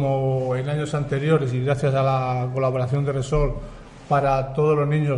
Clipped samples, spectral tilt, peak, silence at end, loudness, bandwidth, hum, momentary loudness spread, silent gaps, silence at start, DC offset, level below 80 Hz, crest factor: under 0.1%; -8 dB/octave; -6 dBFS; 0 s; -22 LUFS; 10.5 kHz; none; 4 LU; none; 0 s; under 0.1%; -38 dBFS; 14 dB